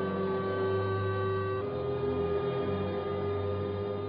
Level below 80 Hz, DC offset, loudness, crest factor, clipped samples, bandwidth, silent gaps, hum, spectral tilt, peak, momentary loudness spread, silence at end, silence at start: -56 dBFS; under 0.1%; -32 LUFS; 12 dB; under 0.1%; 5 kHz; none; none; -6.5 dB/octave; -20 dBFS; 3 LU; 0 s; 0 s